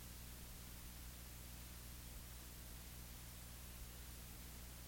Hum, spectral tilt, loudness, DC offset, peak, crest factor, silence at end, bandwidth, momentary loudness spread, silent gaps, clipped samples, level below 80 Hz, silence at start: 60 Hz at -55 dBFS; -3 dB/octave; -54 LUFS; under 0.1%; -42 dBFS; 12 dB; 0 s; 17 kHz; 0 LU; none; under 0.1%; -58 dBFS; 0 s